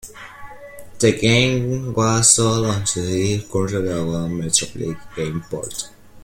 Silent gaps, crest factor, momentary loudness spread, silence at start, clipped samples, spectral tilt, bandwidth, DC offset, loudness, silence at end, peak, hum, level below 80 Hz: none; 20 dB; 22 LU; 0.05 s; under 0.1%; -4 dB/octave; 16.5 kHz; under 0.1%; -19 LUFS; 0.05 s; 0 dBFS; none; -46 dBFS